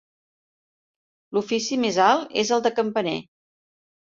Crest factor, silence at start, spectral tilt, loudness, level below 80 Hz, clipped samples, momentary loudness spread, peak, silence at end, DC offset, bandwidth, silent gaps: 20 dB; 1.3 s; -3.5 dB/octave; -23 LUFS; -68 dBFS; under 0.1%; 9 LU; -6 dBFS; 0.85 s; under 0.1%; 7.8 kHz; none